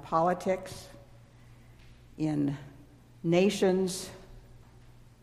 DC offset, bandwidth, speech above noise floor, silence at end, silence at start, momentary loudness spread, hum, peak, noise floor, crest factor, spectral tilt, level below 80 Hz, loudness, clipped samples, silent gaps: under 0.1%; 15.5 kHz; 26 dB; 0.65 s; 0 s; 21 LU; 60 Hz at -55 dBFS; -12 dBFS; -54 dBFS; 20 dB; -6 dB/octave; -58 dBFS; -29 LUFS; under 0.1%; none